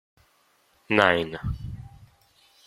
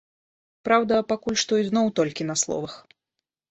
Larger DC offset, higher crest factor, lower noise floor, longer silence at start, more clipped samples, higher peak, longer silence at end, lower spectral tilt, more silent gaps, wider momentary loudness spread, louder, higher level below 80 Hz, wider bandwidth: neither; first, 26 dB vs 20 dB; second, -65 dBFS vs -84 dBFS; first, 0.9 s vs 0.65 s; neither; first, -2 dBFS vs -6 dBFS; about the same, 0.6 s vs 0.7 s; first, -6 dB/octave vs -3.5 dB/octave; neither; first, 19 LU vs 9 LU; about the same, -24 LUFS vs -23 LUFS; first, -46 dBFS vs -62 dBFS; first, 15 kHz vs 8.2 kHz